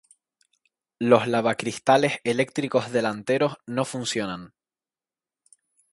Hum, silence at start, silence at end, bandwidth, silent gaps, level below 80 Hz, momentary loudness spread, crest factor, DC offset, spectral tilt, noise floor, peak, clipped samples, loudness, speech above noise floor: none; 1 s; 1.45 s; 11.5 kHz; none; -68 dBFS; 9 LU; 24 dB; under 0.1%; -5 dB/octave; under -90 dBFS; -2 dBFS; under 0.1%; -24 LUFS; over 67 dB